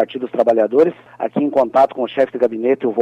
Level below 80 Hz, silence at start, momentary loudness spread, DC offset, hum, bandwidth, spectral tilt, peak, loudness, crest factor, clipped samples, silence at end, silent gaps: -62 dBFS; 0 s; 6 LU; under 0.1%; none; 8.4 kHz; -7.5 dB/octave; -4 dBFS; -17 LUFS; 12 dB; under 0.1%; 0 s; none